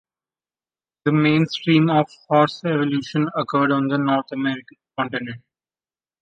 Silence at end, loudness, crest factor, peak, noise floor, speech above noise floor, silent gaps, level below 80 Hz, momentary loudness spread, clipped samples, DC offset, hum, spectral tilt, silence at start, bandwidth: 0.85 s; -20 LUFS; 18 dB; -2 dBFS; under -90 dBFS; over 70 dB; none; -64 dBFS; 11 LU; under 0.1%; under 0.1%; none; -7.5 dB/octave; 1.05 s; 7.6 kHz